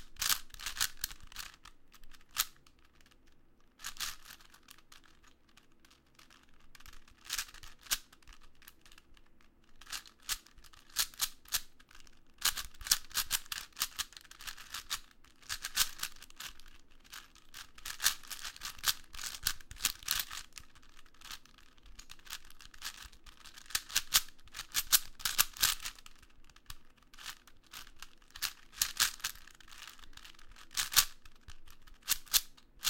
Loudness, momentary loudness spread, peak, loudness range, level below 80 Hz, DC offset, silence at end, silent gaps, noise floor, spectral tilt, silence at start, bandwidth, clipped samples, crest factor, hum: -35 LUFS; 24 LU; -6 dBFS; 12 LU; -56 dBFS; under 0.1%; 0 s; none; -63 dBFS; 2 dB/octave; 0 s; 17 kHz; under 0.1%; 34 dB; none